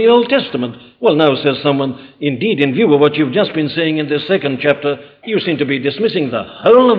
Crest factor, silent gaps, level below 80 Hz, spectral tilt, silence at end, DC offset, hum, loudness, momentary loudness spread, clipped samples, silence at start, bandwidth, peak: 12 dB; none; -58 dBFS; -8.5 dB/octave; 0 s; under 0.1%; none; -15 LUFS; 10 LU; under 0.1%; 0 s; 5.2 kHz; -2 dBFS